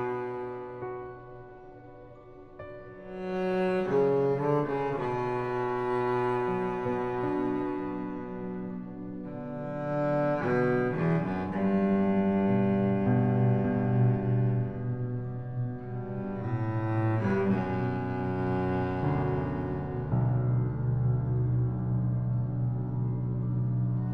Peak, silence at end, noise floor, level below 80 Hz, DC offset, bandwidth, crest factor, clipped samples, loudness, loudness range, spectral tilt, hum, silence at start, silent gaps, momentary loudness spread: -16 dBFS; 0 s; -49 dBFS; -52 dBFS; 0.3%; 4.9 kHz; 14 dB; under 0.1%; -29 LUFS; 6 LU; -10.5 dB/octave; none; 0 s; none; 13 LU